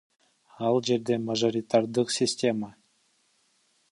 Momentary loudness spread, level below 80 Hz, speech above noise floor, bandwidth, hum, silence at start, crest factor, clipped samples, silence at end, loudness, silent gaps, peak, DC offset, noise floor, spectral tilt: 6 LU; -72 dBFS; 43 dB; 11.5 kHz; none; 0.6 s; 18 dB; under 0.1%; 1.2 s; -26 LUFS; none; -10 dBFS; under 0.1%; -69 dBFS; -4.5 dB/octave